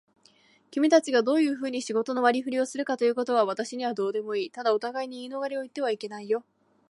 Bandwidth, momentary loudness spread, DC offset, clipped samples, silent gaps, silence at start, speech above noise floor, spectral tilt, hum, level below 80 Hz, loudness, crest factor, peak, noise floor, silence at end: 11.5 kHz; 11 LU; under 0.1%; under 0.1%; none; 0.7 s; 35 dB; -4 dB/octave; none; -82 dBFS; -27 LUFS; 20 dB; -8 dBFS; -61 dBFS; 0.5 s